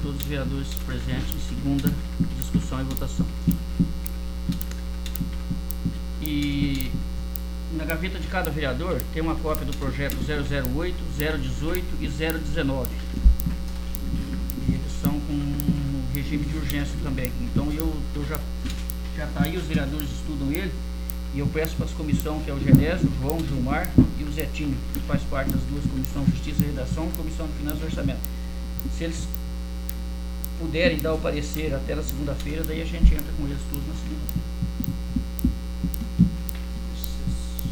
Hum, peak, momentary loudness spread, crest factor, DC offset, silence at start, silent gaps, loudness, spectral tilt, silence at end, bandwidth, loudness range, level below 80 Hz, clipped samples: none; 0 dBFS; 9 LU; 24 dB; under 0.1%; 0 s; none; -27 LUFS; -6.5 dB/octave; 0 s; over 20 kHz; 5 LU; -30 dBFS; under 0.1%